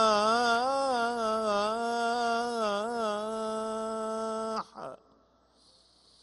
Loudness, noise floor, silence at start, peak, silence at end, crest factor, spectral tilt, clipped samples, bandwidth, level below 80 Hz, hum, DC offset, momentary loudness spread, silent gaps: -30 LUFS; -65 dBFS; 0 s; -12 dBFS; 1.25 s; 18 dB; -3 dB/octave; under 0.1%; 11.5 kHz; -68 dBFS; none; under 0.1%; 9 LU; none